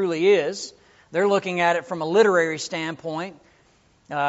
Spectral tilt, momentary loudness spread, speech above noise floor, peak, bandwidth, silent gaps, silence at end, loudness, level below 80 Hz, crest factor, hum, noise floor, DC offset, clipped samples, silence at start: -3.5 dB/octave; 14 LU; 37 dB; -6 dBFS; 8 kHz; none; 0 s; -22 LUFS; -68 dBFS; 18 dB; none; -59 dBFS; under 0.1%; under 0.1%; 0 s